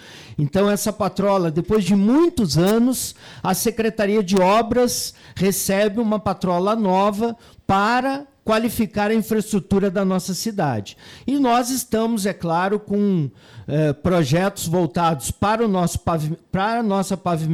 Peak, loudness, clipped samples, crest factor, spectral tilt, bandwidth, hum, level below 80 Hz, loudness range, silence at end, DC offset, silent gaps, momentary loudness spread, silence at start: -10 dBFS; -20 LUFS; under 0.1%; 10 dB; -5.5 dB/octave; 19 kHz; none; -46 dBFS; 2 LU; 0 s; under 0.1%; none; 8 LU; 0.05 s